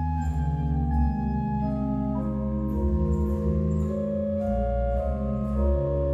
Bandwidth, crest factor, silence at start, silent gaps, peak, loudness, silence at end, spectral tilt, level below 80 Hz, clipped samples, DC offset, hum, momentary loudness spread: 7.8 kHz; 12 dB; 0 s; none; -14 dBFS; -27 LUFS; 0 s; -10.5 dB/octave; -30 dBFS; under 0.1%; under 0.1%; none; 3 LU